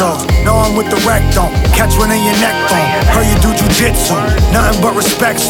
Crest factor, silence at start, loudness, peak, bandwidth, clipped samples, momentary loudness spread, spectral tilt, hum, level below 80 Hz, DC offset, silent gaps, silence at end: 10 dB; 0 s; -11 LUFS; 0 dBFS; 18 kHz; under 0.1%; 2 LU; -4.5 dB/octave; none; -16 dBFS; under 0.1%; none; 0 s